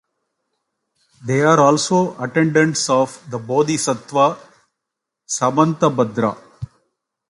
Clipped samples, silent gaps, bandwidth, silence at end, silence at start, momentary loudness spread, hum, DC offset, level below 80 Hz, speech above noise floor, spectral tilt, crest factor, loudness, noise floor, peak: under 0.1%; none; 11.5 kHz; 0.65 s; 1.2 s; 19 LU; none; under 0.1%; -58 dBFS; 65 dB; -5 dB/octave; 18 dB; -17 LUFS; -81 dBFS; 0 dBFS